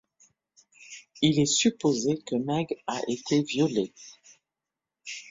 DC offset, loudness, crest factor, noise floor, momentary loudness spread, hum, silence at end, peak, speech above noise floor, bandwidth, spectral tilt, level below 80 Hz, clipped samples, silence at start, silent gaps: under 0.1%; -26 LUFS; 20 dB; -88 dBFS; 22 LU; none; 0 s; -8 dBFS; 62 dB; 7.8 kHz; -4.5 dB/octave; -64 dBFS; under 0.1%; 0.8 s; none